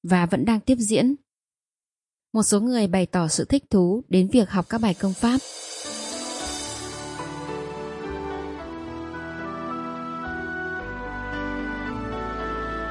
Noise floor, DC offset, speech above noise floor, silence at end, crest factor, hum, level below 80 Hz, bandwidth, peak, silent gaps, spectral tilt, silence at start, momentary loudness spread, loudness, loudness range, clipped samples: under -90 dBFS; under 0.1%; over 69 dB; 0 s; 20 dB; none; -46 dBFS; 11.5 kHz; -6 dBFS; none; -5 dB/octave; 0.05 s; 13 LU; -25 LUFS; 11 LU; under 0.1%